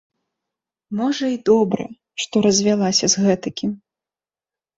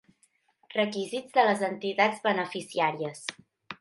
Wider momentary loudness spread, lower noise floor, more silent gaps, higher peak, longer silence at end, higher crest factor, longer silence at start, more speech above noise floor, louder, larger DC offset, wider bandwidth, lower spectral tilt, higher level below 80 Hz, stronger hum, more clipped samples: about the same, 12 LU vs 11 LU; first, under -90 dBFS vs -69 dBFS; neither; first, -4 dBFS vs -8 dBFS; first, 1 s vs 0.05 s; about the same, 18 dB vs 20 dB; first, 0.9 s vs 0.7 s; first, over 72 dB vs 41 dB; first, -19 LUFS vs -28 LUFS; neither; second, 8 kHz vs 11.5 kHz; about the same, -4 dB/octave vs -4 dB/octave; first, -58 dBFS vs -80 dBFS; neither; neither